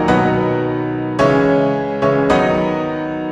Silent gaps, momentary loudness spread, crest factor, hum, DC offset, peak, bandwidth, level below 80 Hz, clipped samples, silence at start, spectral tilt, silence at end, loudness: none; 7 LU; 14 dB; none; under 0.1%; -2 dBFS; 10.5 kHz; -40 dBFS; under 0.1%; 0 s; -7.5 dB/octave; 0 s; -16 LUFS